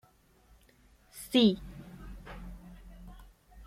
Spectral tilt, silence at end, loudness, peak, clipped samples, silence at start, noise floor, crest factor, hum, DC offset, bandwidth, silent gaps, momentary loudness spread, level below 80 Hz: -5.5 dB/octave; 0 s; -27 LUFS; -12 dBFS; under 0.1%; 1.15 s; -64 dBFS; 22 dB; none; under 0.1%; 15.5 kHz; none; 27 LU; -52 dBFS